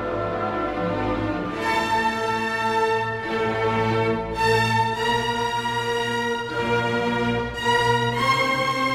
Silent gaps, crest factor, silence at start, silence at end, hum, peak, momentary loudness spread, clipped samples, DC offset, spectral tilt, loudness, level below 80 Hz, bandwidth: none; 16 dB; 0 s; 0 s; none; -8 dBFS; 6 LU; under 0.1%; under 0.1%; -5 dB/octave; -22 LUFS; -44 dBFS; 16 kHz